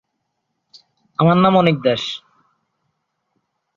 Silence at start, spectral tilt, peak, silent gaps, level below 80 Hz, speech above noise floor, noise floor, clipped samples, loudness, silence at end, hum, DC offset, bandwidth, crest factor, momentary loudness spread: 1.2 s; -7 dB/octave; 0 dBFS; none; -60 dBFS; 59 dB; -74 dBFS; under 0.1%; -16 LUFS; 1.6 s; none; under 0.1%; 7.4 kHz; 20 dB; 16 LU